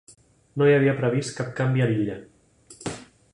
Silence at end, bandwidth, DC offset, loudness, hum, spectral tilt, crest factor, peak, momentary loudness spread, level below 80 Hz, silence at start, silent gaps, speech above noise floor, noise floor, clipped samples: 0.3 s; 11 kHz; under 0.1%; -23 LUFS; none; -6.5 dB/octave; 18 dB; -6 dBFS; 18 LU; -58 dBFS; 0.55 s; none; 30 dB; -52 dBFS; under 0.1%